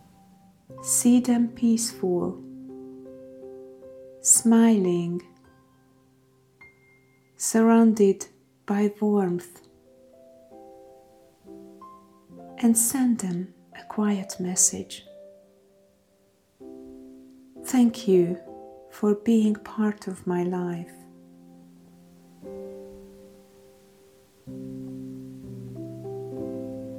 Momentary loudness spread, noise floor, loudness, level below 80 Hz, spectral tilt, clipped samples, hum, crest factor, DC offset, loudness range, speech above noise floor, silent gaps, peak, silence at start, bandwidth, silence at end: 26 LU; -64 dBFS; -23 LUFS; -66 dBFS; -4.5 dB/octave; under 0.1%; none; 22 dB; under 0.1%; 18 LU; 41 dB; none; -6 dBFS; 0.7 s; 16.5 kHz; 0 s